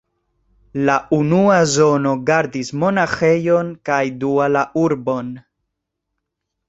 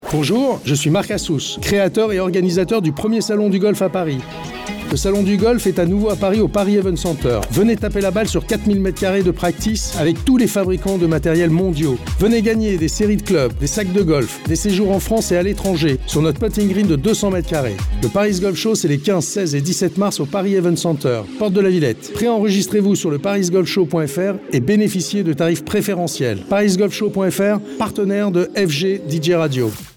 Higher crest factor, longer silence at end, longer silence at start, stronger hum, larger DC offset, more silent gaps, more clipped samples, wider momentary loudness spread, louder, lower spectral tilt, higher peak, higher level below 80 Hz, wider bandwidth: first, 16 dB vs 10 dB; first, 1.3 s vs 0.05 s; first, 0.75 s vs 0 s; neither; neither; neither; neither; first, 9 LU vs 4 LU; about the same, -17 LUFS vs -17 LUFS; about the same, -5.5 dB/octave vs -5.5 dB/octave; first, -2 dBFS vs -6 dBFS; second, -54 dBFS vs -32 dBFS; second, 8.2 kHz vs 18 kHz